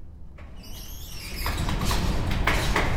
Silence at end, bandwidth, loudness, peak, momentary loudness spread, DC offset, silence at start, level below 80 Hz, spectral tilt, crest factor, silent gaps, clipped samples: 0 s; 17.5 kHz; -27 LUFS; -6 dBFS; 20 LU; under 0.1%; 0 s; -30 dBFS; -4.5 dB/octave; 20 dB; none; under 0.1%